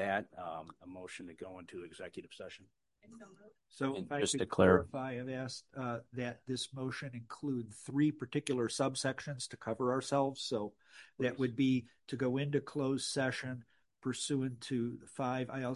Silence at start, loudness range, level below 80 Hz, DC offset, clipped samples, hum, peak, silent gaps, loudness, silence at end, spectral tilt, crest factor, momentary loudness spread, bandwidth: 0 s; 8 LU; -64 dBFS; under 0.1%; under 0.1%; none; -14 dBFS; none; -36 LUFS; 0 s; -5 dB/octave; 24 dB; 15 LU; 11.5 kHz